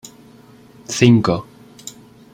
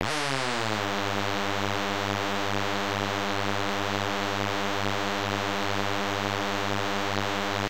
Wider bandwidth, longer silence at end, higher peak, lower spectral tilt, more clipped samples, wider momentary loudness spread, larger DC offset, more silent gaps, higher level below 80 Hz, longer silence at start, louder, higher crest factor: about the same, 15.5 kHz vs 17 kHz; first, 0.45 s vs 0 s; first, 0 dBFS vs -6 dBFS; first, -6 dB/octave vs -4 dB/octave; neither; first, 23 LU vs 0 LU; second, under 0.1% vs 1%; neither; first, -52 dBFS vs -62 dBFS; first, 0.9 s vs 0 s; first, -16 LUFS vs -28 LUFS; about the same, 18 dB vs 22 dB